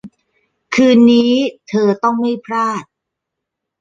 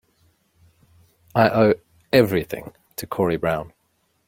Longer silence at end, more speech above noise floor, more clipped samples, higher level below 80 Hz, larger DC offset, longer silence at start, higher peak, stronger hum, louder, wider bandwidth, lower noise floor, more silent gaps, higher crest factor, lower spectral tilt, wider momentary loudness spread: first, 0.95 s vs 0.6 s; first, 66 dB vs 48 dB; neither; second, -62 dBFS vs -54 dBFS; neither; second, 0.05 s vs 1.35 s; about the same, -2 dBFS vs -2 dBFS; neither; first, -14 LUFS vs -21 LUFS; second, 7.6 kHz vs 16.5 kHz; first, -79 dBFS vs -68 dBFS; neither; second, 14 dB vs 20 dB; about the same, -5.5 dB/octave vs -6.5 dB/octave; second, 10 LU vs 17 LU